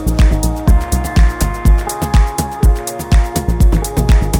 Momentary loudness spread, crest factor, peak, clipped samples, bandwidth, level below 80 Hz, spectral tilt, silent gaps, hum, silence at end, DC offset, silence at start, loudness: 2 LU; 10 dB; -2 dBFS; under 0.1%; 18 kHz; -12 dBFS; -6 dB/octave; none; none; 0 s; under 0.1%; 0 s; -15 LUFS